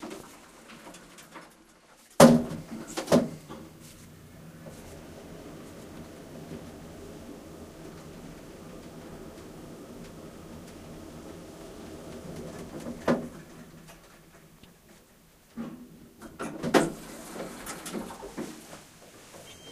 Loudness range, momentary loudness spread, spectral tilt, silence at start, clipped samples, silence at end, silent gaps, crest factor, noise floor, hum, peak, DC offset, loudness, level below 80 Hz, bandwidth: 19 LU; 23 LU; -5 dB/octave; 0 s; under 0.1%; 0 s; none; 32 dB; -58 dBFS; none; -2 dBFS; under 0.1%; -28 LUFS; -58 dBFS; 15.5 kHz